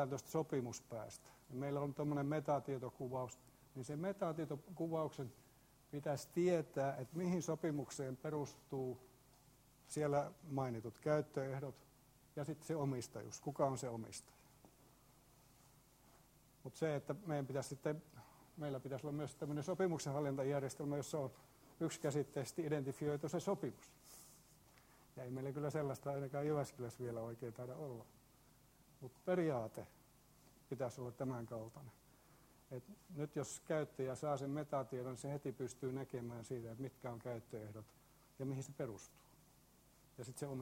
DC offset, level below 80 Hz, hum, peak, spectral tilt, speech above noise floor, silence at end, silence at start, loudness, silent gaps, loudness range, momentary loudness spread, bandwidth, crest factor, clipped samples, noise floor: under 0.1%; -76 dBFS; none; -24 dBFS; -6.5 dB/octave; 26 dB; 0 s; 0 s; -44 LUFS; none; 6 LU; 15 LU; 16 kHz; 20 dB; under 0.1%; -69 dBFS